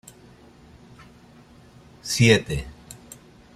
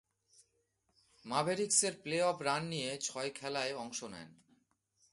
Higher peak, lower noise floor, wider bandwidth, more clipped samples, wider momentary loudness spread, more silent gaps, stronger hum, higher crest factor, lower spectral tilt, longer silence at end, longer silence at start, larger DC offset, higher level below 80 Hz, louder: first, -2 dBFS vs -14 dBFS; second, -50 dBFS vs -79 dBFS; first, 14.5 kHz vs 11.5 kHz; neither; first, 27 LU vs 13 LU; neither; neither; about the same, 24 dB vs 24 dB; first, -4.5 dB/octave vs -2.5 dB/octave; second, 0.6 s vs 0.8 s; first, 2.05 s vs 1.25 s; neither; first, -46 dBFS vs -78 dBFS; first, -20 LUFS vs -35 LUFS